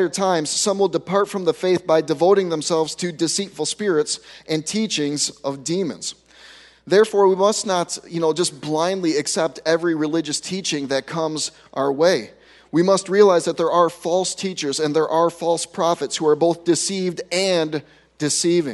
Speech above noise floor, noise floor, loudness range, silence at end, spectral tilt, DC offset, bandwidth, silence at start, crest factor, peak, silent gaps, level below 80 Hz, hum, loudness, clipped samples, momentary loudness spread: 27 dB; -46 dBFS; 3 LU; 0 s; -3.5 dB/octave; under 0.1%; 12 kHz; 0 s; 18 dB; -2 dBFS; none; -66 dBFS; none; -20 LUFS; under 0.1%; 8 LU